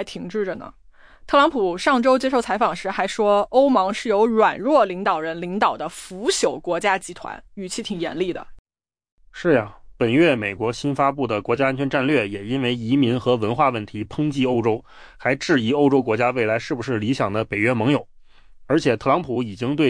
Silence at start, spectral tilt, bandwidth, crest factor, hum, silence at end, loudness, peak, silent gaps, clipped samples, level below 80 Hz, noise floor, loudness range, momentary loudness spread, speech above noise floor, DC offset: 0 s; -5.5 dB/octave; 10.5 kHz; 16 dB; none; 0 s; -21 LUFS; -6 dBFS; 8.59-8.65 s, 9.12-9.18 s; under 0.1%; -52 dBFS; -46 dBFS; 5 LU; 10 LU; 25 dB; under 0.1%